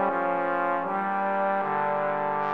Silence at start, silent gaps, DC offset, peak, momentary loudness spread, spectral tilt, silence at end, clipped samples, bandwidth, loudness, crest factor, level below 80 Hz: 0 s; none; 0.3%; -12 dBFS; 1 LU; -8 dB/octave; 0 s; under 0.1%; 5.2 kHz; -26 LUFS; 14 dB; -76 dBFS